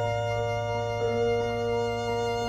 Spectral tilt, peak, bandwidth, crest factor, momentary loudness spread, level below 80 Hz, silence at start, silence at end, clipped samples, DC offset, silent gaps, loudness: -5.5 dB/octave; -16 dBFS; 13.5 kHz; 12 dB; 3 LU; -48 dBFS; 0 s; 0 s; under 0.1%; under 0.1%; none; -28 LUFS